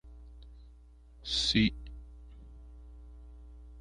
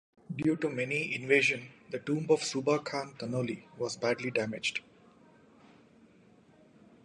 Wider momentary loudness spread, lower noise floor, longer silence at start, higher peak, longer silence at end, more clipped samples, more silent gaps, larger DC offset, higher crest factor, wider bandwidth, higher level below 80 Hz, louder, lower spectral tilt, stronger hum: first, 26 LU vs 12 LU; second, -55 dBFS vs -61 dBFS; second, 0.05 s vs 0.3 s; about the same, -12 dBFS vs -12 dBFS; second, 0 s vs 2.25 s; neither; neither; neither; about the same, 24 dB vs 22 dB; about the same, 10.5 kHz vs 11 kHz; first, -48 dBFS vs -74 dBFS; about the same, -29 LUFS vs -31 LUFS; about the same, -4 dB/octave vs -4.5 dB/octave; neither